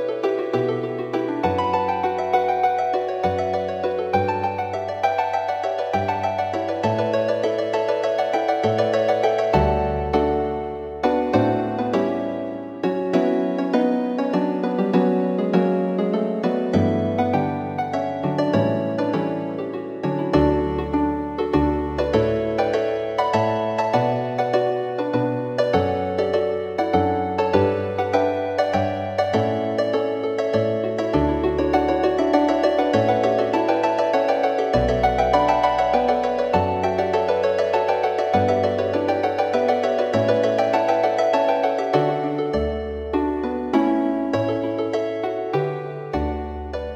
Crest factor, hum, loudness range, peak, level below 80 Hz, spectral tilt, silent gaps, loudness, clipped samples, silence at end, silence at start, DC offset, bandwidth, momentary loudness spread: 16 dB; none; 3 LU; -4 dBFS; -40 dBFS; -7 dB/octave; none; -21 LUFS; under 0.1%; 0 s; 0 s; under 0.1%; 9.2 kHz; 5 LU